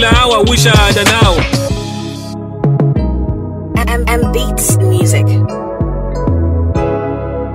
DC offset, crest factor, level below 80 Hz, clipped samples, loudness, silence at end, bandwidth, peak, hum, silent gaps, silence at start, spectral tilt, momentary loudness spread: under 0.1%; 12 dB; -20 dBFS; under 0.1%; -12 LUFS; 0 s; 16.5 kHz; 0 dBFS; none; none; 0 s; -4.5 dB/octave; 11 LU